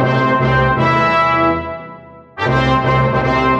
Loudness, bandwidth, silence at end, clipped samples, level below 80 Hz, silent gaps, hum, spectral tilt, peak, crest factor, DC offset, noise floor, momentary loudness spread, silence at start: -14 LUFS; 7.8 kHz; 0 s; under 0.1%; -32 dBFS; none; none; -7.5 dB/octave; -2 dBFS; 12 dB; under 0.1%; -37 dBFS; 14 LU; 0 s